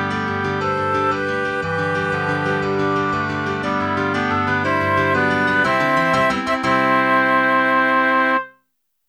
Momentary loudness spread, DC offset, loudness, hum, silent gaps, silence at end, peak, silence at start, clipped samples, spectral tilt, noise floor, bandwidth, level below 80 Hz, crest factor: 6 LU; under 0.1%; -18 LUFS; none; none; 0.6 s; -4 dBFS; 0 s; under 0.1%; -6 dB/octave; -70 dBFS; 13 kHz; -52 dBFS; 14 dB